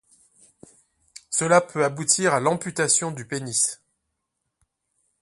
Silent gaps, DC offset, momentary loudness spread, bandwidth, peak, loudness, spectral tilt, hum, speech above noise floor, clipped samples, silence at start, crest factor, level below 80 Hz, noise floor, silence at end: none; under 0.1%; 8 LU; 11.5 kHz; -2 dBFS; -22 LUFS; -3 dB/octave; none; 57 dB; under 0.1%; 1.3 s; 22 dB; -68 dBFS; -79 dBFS; 1.45 s